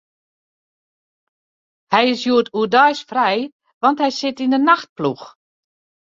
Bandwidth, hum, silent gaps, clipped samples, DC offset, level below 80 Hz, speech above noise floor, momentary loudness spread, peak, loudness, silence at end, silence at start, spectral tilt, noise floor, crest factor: 7.6 kHz; none; 3.52-3.60 s, 3.74-3.81 s, 4.89-4.96 s; under 0.1%; under 0.1%; -68 dBFS; over 73 dB; 10 LU; -2 dBFS; -17 LUFS; 0.75 s; 1.9 s; -4.5 dB/octave; under -90 dBFS; 18 dB